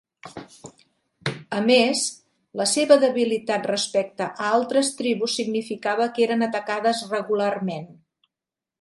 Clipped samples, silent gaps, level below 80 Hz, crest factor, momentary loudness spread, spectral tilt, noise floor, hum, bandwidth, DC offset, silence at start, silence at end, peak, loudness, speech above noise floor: under 0.1%; none; -72 dBFS; 20 dB; 14 LU; -3.5 dB/octave; -89 dBFS; none; 11.5 kHz; under 0.1%; 0.25 s; 0.85 s; -2 dBFS; -22 LUFS; 66 dB